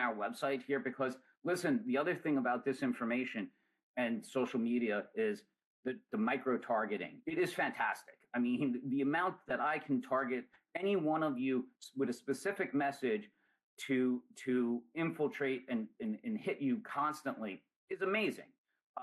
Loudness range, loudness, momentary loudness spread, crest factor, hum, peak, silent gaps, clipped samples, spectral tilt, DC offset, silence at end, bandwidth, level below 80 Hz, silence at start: 2 LU; -37 LUFS; 9 LU; 14 dB; none; -22 dBFS; 3.83-3.94 s, 5.64-5.83 s, 13.63-13.77 s, 17.76-17.88 s, 18.58-18.64 s, 18.83-18.94 s; under 0.1%; -6 dB/octave; under 0.1%; 0 s; 12.5 kHz; -84 dBFS; 0 s